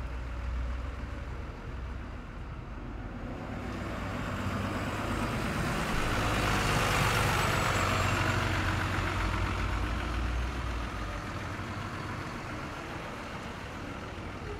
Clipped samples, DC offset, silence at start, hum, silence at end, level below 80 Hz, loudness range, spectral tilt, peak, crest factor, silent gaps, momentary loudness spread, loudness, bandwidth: under 0.1%; under 0.1%; 0 s; none; 0 s; -40 dBFS; 11 LU; -5 dB/octave; -14 dBFS; 18 dB; none; 13 LU; -33 LUFS; 16 kHz